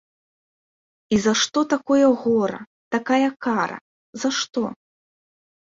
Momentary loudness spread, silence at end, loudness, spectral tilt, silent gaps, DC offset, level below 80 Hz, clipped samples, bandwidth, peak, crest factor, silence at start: 11 LU; 0.95 s; -21 LUFS; -3.5 dB/octave; 2.67-2.91 s, 3.81-4.13 s; under 0.1%; -60 dBFS; under 0.1%; 7.8 kHz; -6 dBFS; 18 dB; 1.1 s